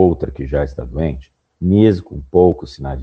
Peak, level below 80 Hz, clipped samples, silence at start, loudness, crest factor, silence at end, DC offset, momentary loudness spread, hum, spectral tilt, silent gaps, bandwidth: 0 dBFS; -30 dBFS; under 0.1%; 0 s; -17 LUFS; 16 dB; 0 s; under 0.1%; 12 LU; none; -9.5 dB/octave; none; 7.4 kHz